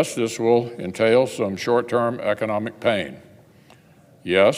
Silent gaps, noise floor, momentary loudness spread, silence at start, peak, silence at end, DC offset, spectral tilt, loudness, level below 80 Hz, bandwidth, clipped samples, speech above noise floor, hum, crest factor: none; -52 dBFS; 8 LU; 0 s; -4 dBFS; 0 s; under 0.1%; -5 dB/octave; -21 LUFS; -64 dBFS; 16 kHz; under 0.1%; 31 dB; none; 18 dB